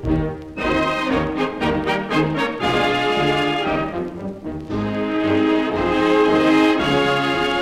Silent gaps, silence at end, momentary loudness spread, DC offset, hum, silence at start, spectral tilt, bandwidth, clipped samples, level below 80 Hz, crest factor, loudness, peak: none; 0 s; 10 LU; under 0.1%; none; 0 s; -6 dB/octave; 12.5 kHz; under 0.1%; -38 dBFS; 14 dB; -19 LUFS; -4 dBFS